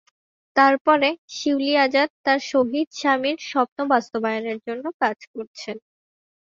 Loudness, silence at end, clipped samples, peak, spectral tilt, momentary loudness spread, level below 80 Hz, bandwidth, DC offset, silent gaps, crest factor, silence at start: -21 LUFS; 0.8 s; under 0.1%; -2 dBFS; -3.5 dB/octave; 16 LU; -70 dBFS; 7.6 kHz; under 0.1%; 0.81-0.85 s, 1.18-1.28 s, 2.10-2.24 s, 2.87-2.91 s, 3.68-3.76 s, 4.94-5.00 s, 5.27-5.34 s, 5.47-5.54 s; 20 dB; 0.55 s